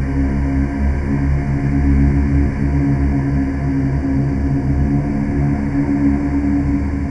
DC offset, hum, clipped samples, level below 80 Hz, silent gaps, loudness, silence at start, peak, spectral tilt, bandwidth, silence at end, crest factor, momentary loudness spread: under 0.1%; none; under 0.1%; -20 dBFS; none; -17 LUFS; 0 s; -2 dBFS; -9.5 dB/octave; 7.6 kHz; 0 s; 12 dB; 3 LU